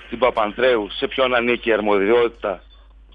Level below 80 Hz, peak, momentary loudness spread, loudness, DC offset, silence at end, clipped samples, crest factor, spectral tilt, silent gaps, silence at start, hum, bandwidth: -46 dBFS; -4 dBFS; 9 LU; -19 LUFS; under 0.1%; 0.55 s; under 0.1%; 16 dB; -7 dB/octave; none; 0 s; none; 5 kHz